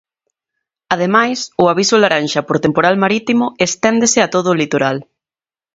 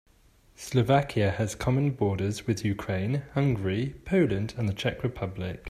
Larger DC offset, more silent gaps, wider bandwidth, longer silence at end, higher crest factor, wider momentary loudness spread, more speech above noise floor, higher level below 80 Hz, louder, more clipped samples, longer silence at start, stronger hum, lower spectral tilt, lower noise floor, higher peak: neither; neither; second, 7.8 kHz vs 14 kHz; first, 0.7 s vs 0 s; about the same, 16 dB vs 18 dB; second, 5 LU vs 8 LU; first, over 76 dB vs 33 dB; about the same, -54 dBFS vs -50 dBFS; first, -14 LUFS vs -28 LUFS; neither; first, 0.9 s vs 0.6 s; neither; second, -4 dB/octave vs -6.5 dB/octave; first, under -90 dBFS vs -60 dBFS; first, 0 dBFS vs -10 dBFS